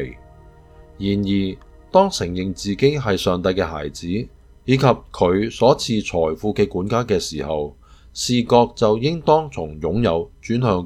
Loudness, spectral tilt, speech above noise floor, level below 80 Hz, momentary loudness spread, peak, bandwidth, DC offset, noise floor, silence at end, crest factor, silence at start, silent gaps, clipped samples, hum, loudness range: -20 LUFS; -6 dB/octave; 26 dB; -42 dBFS; 11 LU; 0 dBFS; 15 kHz; under 0.1%; -45 dBFS; 0 s; 20 dB; 0 s; none; under 0.1%; none; 2 LU